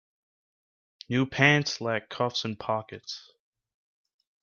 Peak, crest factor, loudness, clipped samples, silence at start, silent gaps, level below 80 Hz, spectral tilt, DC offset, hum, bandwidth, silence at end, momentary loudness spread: -6 dBFS; 24 dB; -26 LUFS; under 0.1%; 1.1 s; none; -66 dBFS; -5 dB/octave; under 0.1%; none; 7.2 kHz; 1.25 s; 18 LU